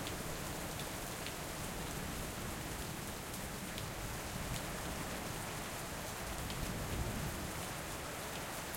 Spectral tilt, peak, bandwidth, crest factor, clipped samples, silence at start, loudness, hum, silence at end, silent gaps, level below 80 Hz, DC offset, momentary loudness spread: -3.5 dB/octave; -24 dBFS; 16.5 kHz; 18 dB; under 0.1%; 0 s; -42 LUFS; none; 0 s; none; -52 dBFS; under 0.1%; 2 LU